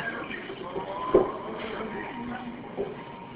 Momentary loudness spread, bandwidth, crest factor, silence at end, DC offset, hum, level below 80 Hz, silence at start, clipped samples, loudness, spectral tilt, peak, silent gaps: 12 LU; 4 kHz; 24 dB; 0 s; under 0.1%; none; -54 dBFS; 0 s; under 0.1%; -31 LUFS; -4 dB/octave; -8 dBFS; none